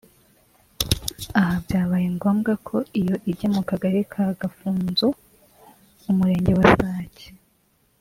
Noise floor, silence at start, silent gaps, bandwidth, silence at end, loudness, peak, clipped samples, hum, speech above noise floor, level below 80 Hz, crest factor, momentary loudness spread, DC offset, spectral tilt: -64 dBFS; 0.8 s; none; 16 kHz; 0.7 s; -22 LUFS; -2 dBFS; under 0.1%; none; 43 dB; -44 dBFS; 22 dB; 11 LU; under 0.1%; -6 dB/octave